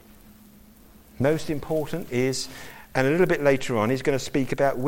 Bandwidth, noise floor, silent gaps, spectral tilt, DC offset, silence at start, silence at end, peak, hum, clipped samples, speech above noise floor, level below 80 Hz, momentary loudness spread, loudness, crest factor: 17 kHz; -51 dBFS; none; -5.5 dB/octave; under 0.1%; 0.3 s; 0 s; -8 dBFS; none; under 0.1%; 27 dB; -50 dBFS; 8 LU; -25 LUFS; 18 dB